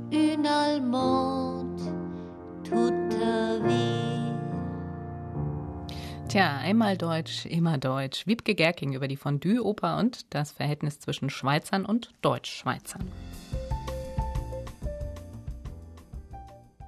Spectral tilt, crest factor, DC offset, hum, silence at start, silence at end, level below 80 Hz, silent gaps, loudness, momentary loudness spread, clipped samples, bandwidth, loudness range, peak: -6 dB/octave; 20 dB; under 0.1%; none; 0 s; 0 s; -44 dBFS; none; -29 LUFS; 15 LU; under 0.1%; 13.5 kHz; 9 LU; -10 dBFS